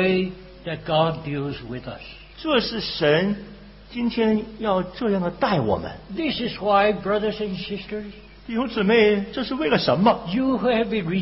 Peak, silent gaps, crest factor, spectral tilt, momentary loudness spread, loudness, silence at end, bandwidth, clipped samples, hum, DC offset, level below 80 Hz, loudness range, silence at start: -6 dBFS; none; 18 dB; -10 dB/octave; 14 LU; -23 LUFS; 0 s; 5.8 kHz; under 0.1%; none; under 0.1%; -48 dBFS; 3 LU; 0 s